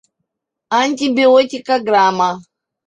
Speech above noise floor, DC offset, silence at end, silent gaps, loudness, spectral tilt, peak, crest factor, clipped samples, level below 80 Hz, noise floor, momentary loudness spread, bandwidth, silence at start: 62 dB; under 0.1%; 0.45 s; none; -14 LUFS; -4 dB/octave; -2 dBFS; 14 dB; under 0.1%; -64 dBFS; -75 dBFS; 8 LU; 9.2 kHz; 0.7 s